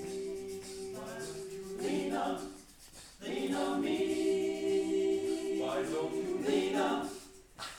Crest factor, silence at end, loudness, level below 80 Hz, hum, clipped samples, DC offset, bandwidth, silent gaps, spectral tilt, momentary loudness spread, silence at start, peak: 16 dB; 0 s; -35 LUFS; -64 dBFS; none; under 0.1%; under 0.1%; 16.5 kHz; none; -4.5 dB/octave; 14 LU; 0 s; -20 dBFS